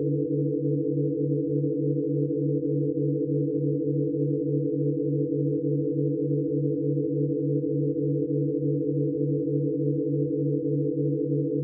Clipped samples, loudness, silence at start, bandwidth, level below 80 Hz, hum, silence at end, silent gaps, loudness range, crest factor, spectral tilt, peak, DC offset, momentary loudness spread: under 0.1%; -26 LUFS; 0 s; 0.6 kHz; -70 dBFS; none; 0 s; none; 0 LU; 12 dB; -20.5 dB/octave; -14 dBFS; under 0.1%; 1 LU